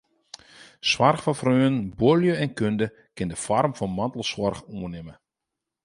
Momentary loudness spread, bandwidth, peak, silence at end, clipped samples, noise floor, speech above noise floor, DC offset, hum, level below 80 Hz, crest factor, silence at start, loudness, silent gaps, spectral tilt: 15 LU; 11.5 kHz; -4 dBFS; 0.7 s; under 0.1%; -85 dBFS; 62 dB; under 0.1%; none; -54 dBFS; 20 dB; 0.6 s; -24 LUFS; none; -5.5 dB/octave